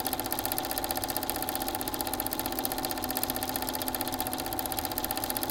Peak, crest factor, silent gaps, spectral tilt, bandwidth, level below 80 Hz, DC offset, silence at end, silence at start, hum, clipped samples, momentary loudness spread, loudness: -6 dBFS; 26 dB; none; -2.5 dB/octave; 17.5 kHz; -50 dBFS; under 0.1%; 0 s; 0 s; none; under 0.1%; 1 LU; -31 LUFS